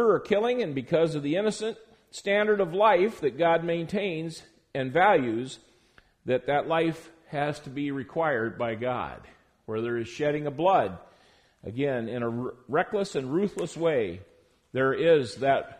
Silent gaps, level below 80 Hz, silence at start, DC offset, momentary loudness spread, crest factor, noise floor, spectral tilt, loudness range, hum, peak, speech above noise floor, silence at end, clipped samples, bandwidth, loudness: none; -62 dBFS; 0 s; under 0.1%; 15 LU; 18 dB; -61 dBFS; -6 dB/octave; 5 LU; none; -8 dBFS; 35 dB; 0.05 s; under 0.1%; 10.5 kHz; -27 LUFS